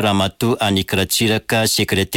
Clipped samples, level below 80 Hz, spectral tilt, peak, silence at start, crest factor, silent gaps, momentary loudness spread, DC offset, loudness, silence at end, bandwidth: under 0.1%; -44 dBFS; -4 dB/octave; -6 dBFS; 0 s; 10 dB; none; 2 LU; under 0.1%; -17 LUFS; 0 s; 17 kHz